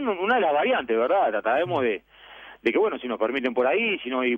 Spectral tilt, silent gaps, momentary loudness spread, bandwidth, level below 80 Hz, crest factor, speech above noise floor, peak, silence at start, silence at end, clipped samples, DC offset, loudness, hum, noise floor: -7 dB/octave; none; 6 LU; 6 kHz; -64 dBFS; 14 dB; 23 dB; -10 dBFS; 0 s; 0 s; under 0.1%; under 0.1%; -24 LUFS; none; -46 dBFS